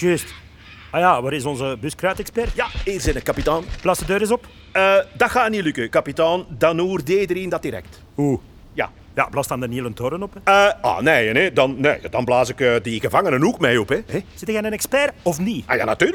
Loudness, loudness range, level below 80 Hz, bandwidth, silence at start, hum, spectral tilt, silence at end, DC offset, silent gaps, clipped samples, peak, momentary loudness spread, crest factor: -20 LUFS; 5 LU; -38 dBFS; 19 kHz; 0 s; none; -4.5 dB/octave; 0 s; under 0.1%; none; under 0.1%; 0 dBFS; 9 LU; 18 dB